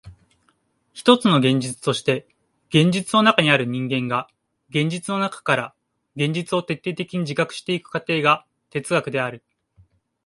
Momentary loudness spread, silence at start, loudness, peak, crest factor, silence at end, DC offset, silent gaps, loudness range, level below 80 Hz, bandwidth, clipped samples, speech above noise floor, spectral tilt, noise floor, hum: 10 LU; 0.05 s; -21 LUFS; 0 dBFS; 22 dB; 0.9 s; under 0.1%; none; 6 LU; -62 dBFS; 11.5 kHz; under 0.1%; 45 dB; -5 dB/octave; -65 dBFS; none